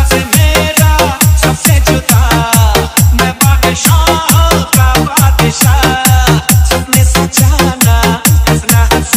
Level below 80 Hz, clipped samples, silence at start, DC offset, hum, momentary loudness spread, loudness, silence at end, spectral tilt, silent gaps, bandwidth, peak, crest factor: -14 dBFS; 0.5%; 0 s; under 0.1%; none; 1 LU; -8 LUFS; 0 s; -4 dB/octave; none; 16.5 kHz; 0 dBFS; 8 dB